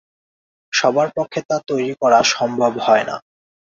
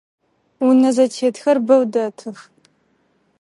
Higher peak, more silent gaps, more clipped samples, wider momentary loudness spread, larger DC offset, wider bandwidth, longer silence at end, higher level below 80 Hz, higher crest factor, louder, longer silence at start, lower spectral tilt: about the same, -2 dBFS vs -2 dBFS; first, 1.45-1.49 s vs none; neither; second, 9 LU vs 13 LU; neither; second, 7.8 kHz vs 11.5 kHz; second, 0.6 s vs 1 s; first, -62 dBFS vs -74 dBFS; about the same, 18 dB vs 16 dB; about the same, -17 LUFS vs -16 LUFS; about the same, 0.7 s vs 0.6 s; second, -3 dB/octave vs -5 dB/octave